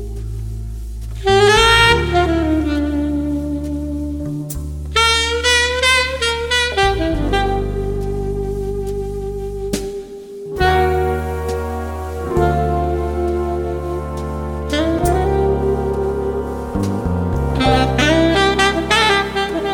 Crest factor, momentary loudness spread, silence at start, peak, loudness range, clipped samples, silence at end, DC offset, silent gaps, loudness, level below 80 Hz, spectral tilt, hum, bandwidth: 18 dB; 12 LU; 0 s; 0 dBFS; 6 LU; under 0.1%; 0 s; under 0.1%; none; -17 LUFS; -26 dBFS; -4.5 dB/octave; none; 16.5 kHz